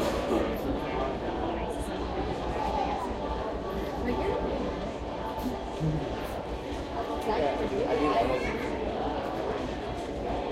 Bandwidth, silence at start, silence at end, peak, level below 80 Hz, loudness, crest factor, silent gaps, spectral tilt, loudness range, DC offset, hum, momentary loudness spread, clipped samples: 16 kHz; 0 s; 0 s; -14 dBFS; -42 dBFS; -31 LUFS; 16 dB; none; -6.5 dB/octave; 3 LU; under 0.1%; none; 7 LU; under 0.1%